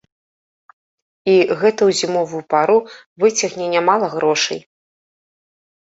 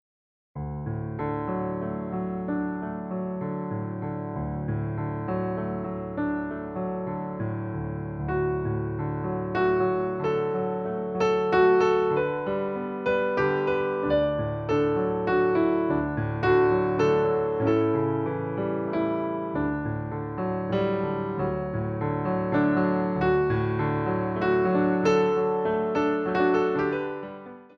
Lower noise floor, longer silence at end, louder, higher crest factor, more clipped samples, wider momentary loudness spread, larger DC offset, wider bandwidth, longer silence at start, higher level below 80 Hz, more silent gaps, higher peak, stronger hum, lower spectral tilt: about the same, under -90 dBFS vs under -90 dBFS; first, 1.25 s vs 0.1 s; first, -17 LUFS vs -26 LUFS; about the same, 18 dB vs 16 dB; neither; about the same, 7 LU vs 9 LU; neither; first, 8 kHz vs 6.4 kHz; first, 1.25 s vs 0.55 s; second, -64 dBFS vs -48 dBFS; first, 3.06-3.16 s vs none; first, -2 dBFS vs -10 dBFS; neither; second, -3.5 dB/octave vs -8.5 dB/octave